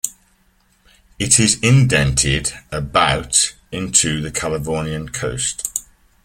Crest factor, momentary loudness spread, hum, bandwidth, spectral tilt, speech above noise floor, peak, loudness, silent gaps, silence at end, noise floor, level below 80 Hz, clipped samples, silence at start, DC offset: 18 dB; 12 LU; none; 16.5 kHz; -3 dB/octave; 41 dB; 0 dBFS; -17 LUFS; none; 0.45 s; -58 dBFS; -36 dBFS; under 0.1%; 0.05 s; under 0.1%